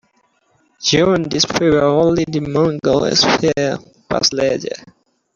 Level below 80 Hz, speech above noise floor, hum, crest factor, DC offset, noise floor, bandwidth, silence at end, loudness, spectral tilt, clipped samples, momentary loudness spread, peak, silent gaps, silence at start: -46 dBFS; 45 dB; none; 16 dB; under 0.1%; -60 dBFS; 7.6 kHz; 0.6 s; -15 LUFS; -4 dB/octave; under 0.1%; 10 LU; -2 dBFS; none; 0.8 s